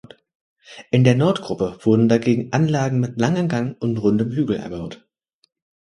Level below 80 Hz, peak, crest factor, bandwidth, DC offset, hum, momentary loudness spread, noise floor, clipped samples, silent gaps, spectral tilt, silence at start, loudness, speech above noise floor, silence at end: -54 dBFS; 0 dBFS; 20 dB; 11 kHz; under 0.1%; none; 9 LU; -66 dBFS; under 0.1%; none; -7.5 dB/octave; 0.7 s; -19 LUFS; 47 dB; 0.9 s